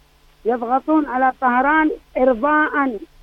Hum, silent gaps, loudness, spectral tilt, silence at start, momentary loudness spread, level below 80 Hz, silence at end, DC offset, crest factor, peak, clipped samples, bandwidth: none; none; -18 LUFS; -6.5 dB/octave; 0.45 s; 8 LU; -48 dBFS; 0.15 s; under 0.1%; 14 dB; -4 dBFS; under 0.1%; 5.2 kHz